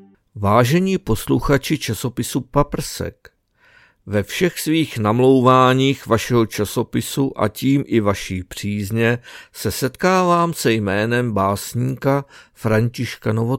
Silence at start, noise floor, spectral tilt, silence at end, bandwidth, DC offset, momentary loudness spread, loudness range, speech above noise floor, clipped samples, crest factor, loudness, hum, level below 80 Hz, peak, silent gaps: 0.35 s; -54 dBFS; -5.5 dB/octave; 0 s; 17 kHz; under 0.1%; 10 LU; 5 LU; 36 dB; under 0.1%; 18 dB; -19 LUFS; none; -40 dBFS; 0 dBFS; none